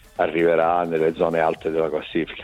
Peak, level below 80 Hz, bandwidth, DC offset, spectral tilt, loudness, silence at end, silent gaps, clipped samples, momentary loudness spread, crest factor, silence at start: -4 dBFS; -52 dBFS; 13 kHz; under 0.1%; -7 dB/octave; -21 LUFS; 0 s; none; under 0.1%; 6 LU; 16 dB; 0.2 s